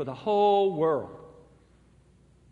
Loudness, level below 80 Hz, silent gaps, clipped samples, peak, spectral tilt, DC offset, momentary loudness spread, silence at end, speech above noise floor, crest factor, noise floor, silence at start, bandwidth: -25 LUFS; -64 dBFS; none; under 0.1%; -12 dBFS; -7.5 dB/octave; under 0.1%; 10 LU; 1.3 s; 34 dB; 16 dB; -59 dBFS; 0 s; 7.4 kHz